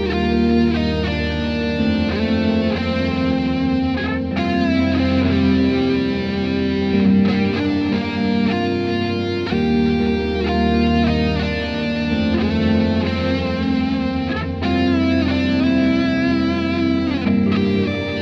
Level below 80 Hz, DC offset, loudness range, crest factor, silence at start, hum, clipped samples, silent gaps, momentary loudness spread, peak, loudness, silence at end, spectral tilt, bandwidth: -34 dBFS; under 0.1%; 2 LU; 12 dB; 0 s; none; under 0.1%; none; 5 LU; -6 dBFS; -18 LUFS; 0 s; -7.5 dB/octave; 7.2 kHz